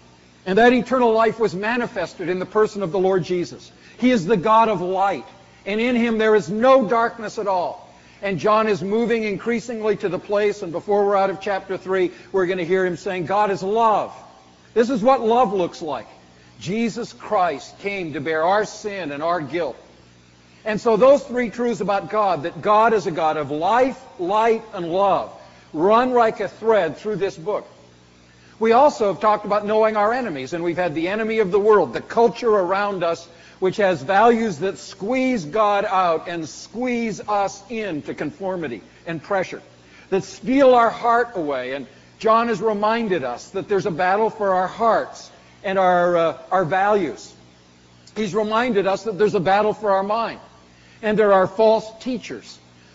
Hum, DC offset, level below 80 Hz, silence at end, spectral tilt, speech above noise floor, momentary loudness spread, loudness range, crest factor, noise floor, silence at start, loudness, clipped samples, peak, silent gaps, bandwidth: none; under 0.1%; -56 dBFS; 0.4 s; -4 dB/octave; 31 dB; 13 LU; 4 LU; 16 dB; -51 dBFS; 0.45 s; -20 LUFS; under 0.1%; -4 dBFS; none; 8 kHz